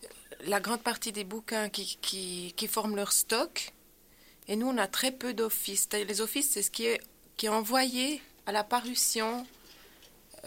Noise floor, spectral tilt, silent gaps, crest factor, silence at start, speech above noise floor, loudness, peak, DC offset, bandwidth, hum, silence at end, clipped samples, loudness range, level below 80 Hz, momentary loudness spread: -60 dBFS; -1.5 dB/octave; none; 20 dB; 0 s; 28 dB; -30 LUFS; -12 dBFS; under 0.1%; 16.5 kHz; none; 0 s; under 0.1%; 2 LU; -66 dBFS; 10 LU